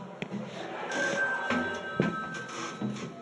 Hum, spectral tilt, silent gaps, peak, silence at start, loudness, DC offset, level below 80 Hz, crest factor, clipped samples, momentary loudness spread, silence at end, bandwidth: none; -4.5 dB/octave; none; -10 dBFS; 0 s; -32 LUFS; under 0.1%; -70 dBFS; 22 dB; under 0.1%; 10 LU; 0 s; 11.5 kHz